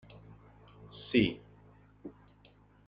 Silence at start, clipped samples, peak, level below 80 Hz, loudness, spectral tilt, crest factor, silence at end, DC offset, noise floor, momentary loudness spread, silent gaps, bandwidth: 0.95 s; under 0.1%; -14 dBFS; -62 dBFS; -31 LUFS; -8.5 dB/octave; 24 dB; 0.75 s; under 0.1%; -62 dBFS; 26 LU; none; 5.6 kHz